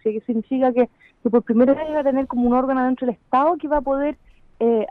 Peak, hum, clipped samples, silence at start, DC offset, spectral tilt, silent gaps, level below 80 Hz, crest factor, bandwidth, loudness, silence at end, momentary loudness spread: -6 dBFS; none; under 0.1%; 0.05 s; under 0.1%; -9.5 dB/octave; none; -46 dBFS; 14 dB; 4.1 kHz; -20 LUFS; 0.05 s; 7 LU